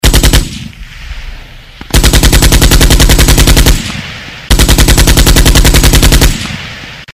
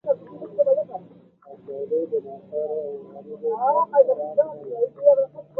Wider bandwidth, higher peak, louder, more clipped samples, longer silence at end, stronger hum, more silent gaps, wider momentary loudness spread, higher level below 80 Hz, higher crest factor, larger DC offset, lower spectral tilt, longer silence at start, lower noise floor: first, over 20 kHz vs 1.8 kHz; first, 0 dBFS vs -4 dBFS; first, -6 LUFS vs -23 LUFS; first, 4% vs under 0.1%; second, 0 s vs 0.15 s; neither; neither; first, 19 LU vs 16 LU; first, -8 dBFS vs -76 dBFS; second, 6 dB vs 20 dB; first, 0.4% vs under 0.1%; second, -3.5 dB/octave vs -10 dB/octave; about the same, 0.05 s vs 0.05 s; second, -29 dBFS vs -49 dBFS